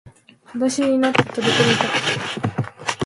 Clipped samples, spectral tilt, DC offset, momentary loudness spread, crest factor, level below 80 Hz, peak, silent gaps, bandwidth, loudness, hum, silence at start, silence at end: under 0.1%; -4 dB/octave; under 0.1%; 9 LU; 20 dB; -56 dBFS; 0 dBFS; none; 11.5 kHz; -19 LUFS; none; 0.05 s; 0 s